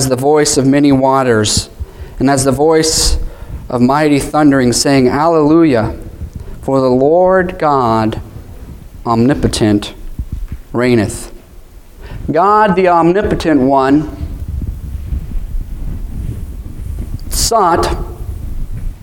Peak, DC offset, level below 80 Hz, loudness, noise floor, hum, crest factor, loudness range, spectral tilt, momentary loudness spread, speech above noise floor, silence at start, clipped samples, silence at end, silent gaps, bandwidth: 0 dBFS; under 0.1%; -24 dBFS; -12 LUFS; -35 dBFS; none; 12 dB; 6 LU; -5 dB/octave; 18 LU; 25 dB; 0 s; under 0.1%; 0.05 s; none; 18 kHz